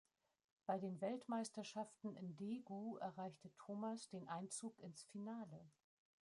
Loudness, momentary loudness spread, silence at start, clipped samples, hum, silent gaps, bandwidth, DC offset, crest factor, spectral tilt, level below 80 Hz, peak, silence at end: -50 LUFS; 8 LU; 0.7 s; under 0.1%; none; none; 11.5 kHz; under 0.1%; 20 dB; -5.5 dB/octave; under -90 dBFS; -30 dBFS; 0.5 s